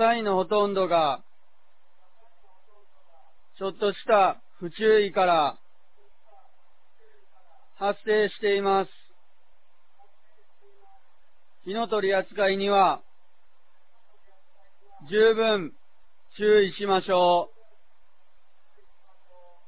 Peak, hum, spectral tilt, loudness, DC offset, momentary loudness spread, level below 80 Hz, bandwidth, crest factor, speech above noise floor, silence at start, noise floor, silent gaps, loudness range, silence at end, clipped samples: -8 dBFS; none; -8.5 dB/octave; -24 LUFS; 0.8%; 13 LU; -66 dBFS; 4 kHz; 18 dB; 46 dB; 0 s; -69 dBFS; none; 7 LU; 2.2 s; under 0.1%